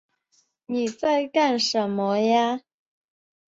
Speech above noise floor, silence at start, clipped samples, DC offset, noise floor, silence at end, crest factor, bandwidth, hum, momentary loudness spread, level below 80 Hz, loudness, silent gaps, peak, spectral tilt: 45 dB; 0.7 s; under 0.1%; under 0.1%; -67 dBFS; 1 s; 18 dB; 8 kHz; none; 7 LU; -72 dBFS; -23 LUFS; none; -8 dBFS; -4 dB/octave